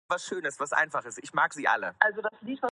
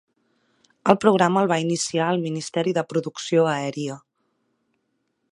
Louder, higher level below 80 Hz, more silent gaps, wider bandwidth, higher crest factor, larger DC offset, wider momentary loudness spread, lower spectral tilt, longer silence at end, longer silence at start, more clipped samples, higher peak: second, -28 LUFS vs -22 LUFS; second, -78 dBFS vs -66 dBFS; neither; about the same, 11.5 kHz vs 11.5 kHz; about the same, 26 dB vs 24 dB; neither; about the same, 9 LU vs 10 LU; second, -2.5 dB/octave vs -5 dB/octave; second, 0.05 s vs 1.35 s; second, 0.1 s vs 0.85 s; neither; second, -4 dBFS vs 0 dBFS